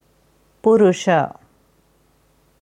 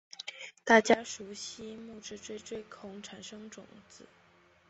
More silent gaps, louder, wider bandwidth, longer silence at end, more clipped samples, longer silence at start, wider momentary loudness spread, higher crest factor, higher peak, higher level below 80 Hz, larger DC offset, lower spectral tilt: neither; first, -17 LUFS vs -30 LUFS; first, 10 kHz vs 8.2 kHz; first, 1.3 s vs 0.65 s; neither; first, 0.65 s vs 0.2 s; second, 8 LU vs 22 LU; second, 18 dB vs 26 dB; first, -4 dBFS vs -8 dBFS; first, -62 dBFS vs -72 dBFS; neither; first, -6 dB/octave vs -3 dB/octave